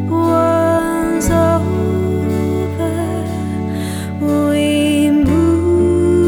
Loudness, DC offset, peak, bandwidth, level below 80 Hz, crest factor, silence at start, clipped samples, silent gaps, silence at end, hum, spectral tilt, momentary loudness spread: -15 LUFS; under 0.1%; -2 dBFS; 17.5 kHz; -34 dBFS; 12 dB; 0 s; under 0.1%; none; 0 s; none; -6.5 dB/octave; 8 LU